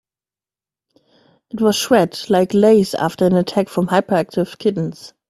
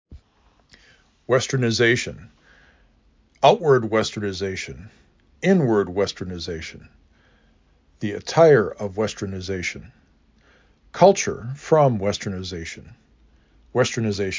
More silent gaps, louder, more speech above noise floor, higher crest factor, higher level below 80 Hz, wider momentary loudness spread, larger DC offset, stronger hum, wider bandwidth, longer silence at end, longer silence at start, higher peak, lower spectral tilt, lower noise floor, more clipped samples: neither; first, -17 LUFS vs -21 LUFS; first, over 74 dB vs 39 dB; about the same, 18 dB vs 22 dB; second, -56 dBFS vs -48 dBFS; second, 8 LU vs 16 LU; neither; neither; first, 15 kHz vs 7.6 kHz; first, 0.2 s vs 0 s; first, 1.55 s vs 0.1 s; about the same, 0 dBFS vs -2 dBFS; about the same, -5.5 dB/octave vs -5 dB/octave; first, under -90 dBFS vs -60 dBFS; neither